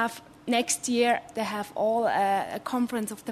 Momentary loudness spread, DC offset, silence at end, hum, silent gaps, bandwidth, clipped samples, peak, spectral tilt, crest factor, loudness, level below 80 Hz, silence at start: 7 LU; under 0.1%; 0 s; none; none; 13.5 kHz; under 0.1%; -12 dBFS; -3 dB/octave; 16 dB; -27 LUFS; -68 dBFS; 0 s